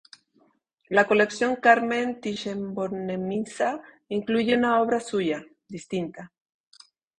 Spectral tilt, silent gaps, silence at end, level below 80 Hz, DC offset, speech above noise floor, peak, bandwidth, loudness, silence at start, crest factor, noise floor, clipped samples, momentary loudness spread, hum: -5 dB/octave; none; 0.95 s; -66 dBFS; under 0.1%; 41 dB; -4 dBFS; 10.5 kHz; -25 LUFS; 0.9 s; 22 dB; -66 dBFS; under 0.1%; 14 LU; none